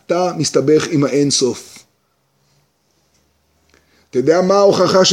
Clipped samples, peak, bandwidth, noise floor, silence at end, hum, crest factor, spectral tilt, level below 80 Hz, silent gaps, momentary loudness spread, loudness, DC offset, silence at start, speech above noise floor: under 0.1%; 0 dBFS; 14 kHz; -63 dBFS; 0 s; 50 Hz at -55 dBFS; 16 dB; -4 dB/octave; -62 dBFS; none; 8 LU; -14 LUFS; under 0.1%; 0.1 s; 49 dB